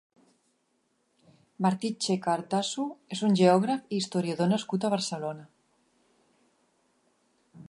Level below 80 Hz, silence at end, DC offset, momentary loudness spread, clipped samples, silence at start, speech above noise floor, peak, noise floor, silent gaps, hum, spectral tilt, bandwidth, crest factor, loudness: -76 dBFS; 0.05 s; under 0.1%; 12 LU; under 0.1%; 1.6 s; 46 dB; -10 dBFS; -73 dBFS; none; none; -5.5 dB/octave; 11.5 kHz; 22 dB; -28 LUFS